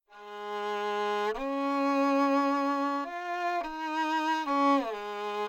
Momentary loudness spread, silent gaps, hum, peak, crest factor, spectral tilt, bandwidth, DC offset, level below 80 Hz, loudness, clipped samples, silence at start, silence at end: 10 LU; none; none; -16 dBFS; 14 dB; -4 dB/octave; 15.5 kHz; under 0.1%; -62 dBFS; -29 LUFS; under 0.1%; 0.1 s; 0 s